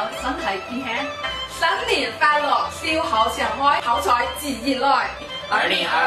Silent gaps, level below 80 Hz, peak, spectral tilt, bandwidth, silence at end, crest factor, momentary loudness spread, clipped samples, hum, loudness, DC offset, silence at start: none; -46 dBFS; -4 dBFS; -2.5 dB/octave; 15.5 kHz; 0 s; 18 dB; 8 LU; under 0.1%; none; -21 LUFS; under 0.1%; 0 s